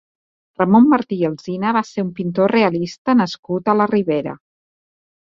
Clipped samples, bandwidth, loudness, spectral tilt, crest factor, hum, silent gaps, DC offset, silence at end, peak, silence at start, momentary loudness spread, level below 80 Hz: under 0.1%; 7.4 kHz; -17 LUFS; -7.5 dB/octave; 16 dB; none; 2.98-3.05 s, 3.39-3.43 s; under 0.1%; 0.95 s; -2 dBFS; 0.6 s; 10 LU; -60 dBFS